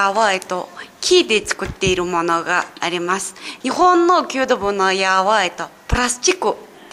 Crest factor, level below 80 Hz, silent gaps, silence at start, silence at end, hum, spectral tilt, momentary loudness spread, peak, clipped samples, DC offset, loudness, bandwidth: 14 dB; -38 dBFS; none; 0 s; 0.25 s; none; -3 dB/octave; 11 LU; -2 dBFS; under 0.1%; under 0.1%; -17 LUFS; 14.5 kHz